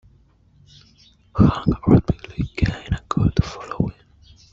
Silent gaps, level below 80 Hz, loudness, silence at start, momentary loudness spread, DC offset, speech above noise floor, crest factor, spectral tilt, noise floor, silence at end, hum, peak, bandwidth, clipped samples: none; -34 dBFS; -21 LUFS; 1.35 s; 12 LU; under 0.1%; 36 dB; 18 dB; -8.5 dB/octave; -55 dBFS; 0.65 s; none; -2 dBFS; 7.6 kHz; under 0.1%